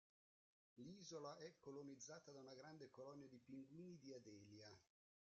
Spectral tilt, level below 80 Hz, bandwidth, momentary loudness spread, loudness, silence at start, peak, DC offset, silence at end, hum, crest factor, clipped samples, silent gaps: -5 dB/octave; under -90 dBFS; 7.6 kHz; 7 LU; -60 LUFS; 0.75 s; -42 dBFS; under 0.1%; 0.35 s; none; 18 dB; under 0.1%; none